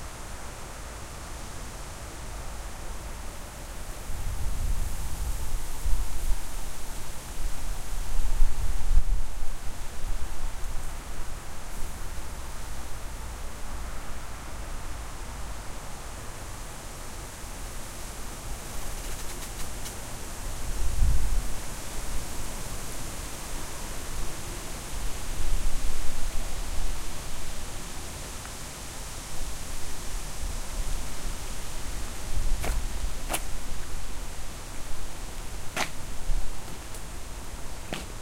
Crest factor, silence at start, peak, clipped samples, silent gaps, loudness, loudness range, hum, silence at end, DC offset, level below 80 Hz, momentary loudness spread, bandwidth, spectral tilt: 20 dB; 0 s; -6 dBFS; under 0.1%; none; -37 LUFS; 5 LU; none; 0 s; under 0.1%; -32 dBFS; 8 LU; 16 kHz; -3.5 dB/octave